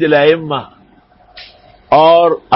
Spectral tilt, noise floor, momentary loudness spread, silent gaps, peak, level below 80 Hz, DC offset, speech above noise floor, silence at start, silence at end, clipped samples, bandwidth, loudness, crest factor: -9 dB/octave; -47 dBFS; 13 LU; none; 0 dBFS; -50 dBFS; under 0.1%; 37 dB; 0 s; 0 s; under 0.1%; 5.8 kHz; -11 LUFS; 12 dB